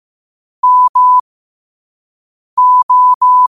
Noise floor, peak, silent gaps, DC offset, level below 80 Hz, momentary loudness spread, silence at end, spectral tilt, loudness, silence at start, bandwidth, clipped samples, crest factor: under -90 dBFS; -4 dBFS; 0.89-0.94 s, 1.20-2.57 s, 2.83-2.89 s, 3.15-3.21 s; 0.3%; -68 dBFS; 6 LU; 0.05 s; -1 dB/octave; -9 LUFS; 0.65 s; 1.3 kHz; under 0.1%; 8 dB